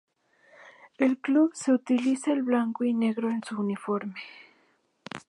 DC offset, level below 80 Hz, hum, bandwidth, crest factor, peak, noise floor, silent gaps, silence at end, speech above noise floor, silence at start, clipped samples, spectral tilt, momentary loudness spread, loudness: under 0.1%; -80 dBFS; none; 11 kHz; 18 dB; -10 dBFS; -68 dBFS; none; 0.1 s; 41 dB; 0.6 s; under 0.1%; -5.5 dB/octave; 11 LU; -27 LUFS